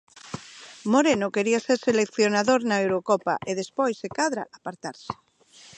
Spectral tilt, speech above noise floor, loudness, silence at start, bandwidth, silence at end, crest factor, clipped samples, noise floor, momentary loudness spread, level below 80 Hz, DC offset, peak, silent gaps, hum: -4 dB/octave; 29 dB; -24 LUFS; 0.25 s; 9.8 kHz; 0.65 s; 18 dB; under 0.1%; -53 dBFS; 17 LU; -66 dBFS; under 0.1%; -6 dBFS; none; none